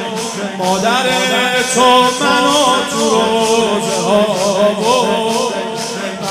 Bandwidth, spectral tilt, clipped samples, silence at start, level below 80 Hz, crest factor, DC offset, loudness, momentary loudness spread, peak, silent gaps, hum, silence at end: 16 kHz; -3 dB/octave; under 0.1%; 0 s; -52 dBFS; 14 dB; under 0.1%; -13 LUFS; 9 LU; 0 dBFS; none; none; 0 s